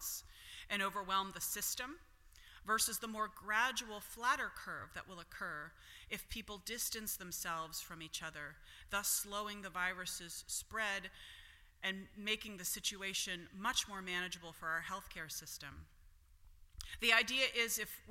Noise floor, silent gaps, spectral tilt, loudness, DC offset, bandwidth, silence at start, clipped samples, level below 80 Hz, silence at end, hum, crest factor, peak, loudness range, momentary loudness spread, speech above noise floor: -63 dBFS; none; -1 dB/octave; -39 LUFS; under 0.1%; 16.5 kHz; 0 s; under 0.1%; -64 dBFS; 0 s; none; 28 dB; -14 dBFS; 5 LU; 16 LU; 22 dB